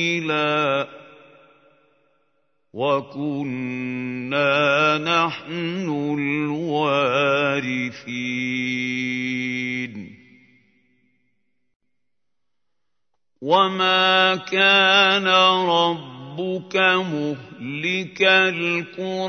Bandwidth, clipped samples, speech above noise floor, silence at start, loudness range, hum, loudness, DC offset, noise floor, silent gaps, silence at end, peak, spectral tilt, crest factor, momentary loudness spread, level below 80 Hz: 6.6 kHz; under 0.1%; 63 dB; 0 s; 12 LU; none; -20 LUFS; under 0.1%; -84 dBFS; 11.76-11.80 s; 0 s; -2 dBFS; -4.5 dB/octave; 20 dB; 13 LU; -72 dBFS